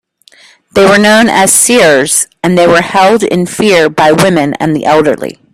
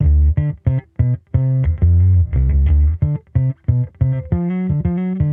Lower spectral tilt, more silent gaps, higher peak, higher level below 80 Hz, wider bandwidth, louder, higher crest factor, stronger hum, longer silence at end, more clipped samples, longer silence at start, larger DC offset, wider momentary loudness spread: second, -3.5 dB/octave vs -13 dB/octave; neither; first, 0 dBFS vs -4 dBFS; second, -44 dBFS vs -20 dBFS; first, over 20 kHz vs 2.7 kHz; first, -7 LUFS vs -17 LUFS; about the same, 8 dB vs 12 dB; neither; first, 0.2 s vs 0 s; first, 0.4% vs under 0.1%; first, 0.75 s vs 0 s; neither; about the same, 7 LU vs 6 LU